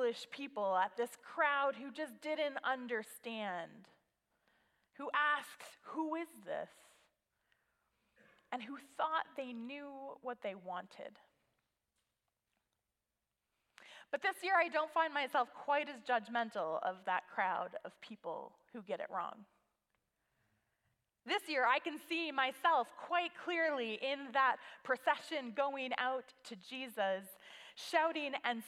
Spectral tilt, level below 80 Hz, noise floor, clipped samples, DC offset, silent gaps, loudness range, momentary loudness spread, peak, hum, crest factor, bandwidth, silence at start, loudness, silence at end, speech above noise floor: -3 dB/octave; under -90 dBFS; -90 dBFS; under 0.1%; under 0.1%; none; 12 LU; 15 LU; -18 dBFS; none; 22 dB; 16 kHz; 0 s; -38 LUFS; 0 s; 51 dB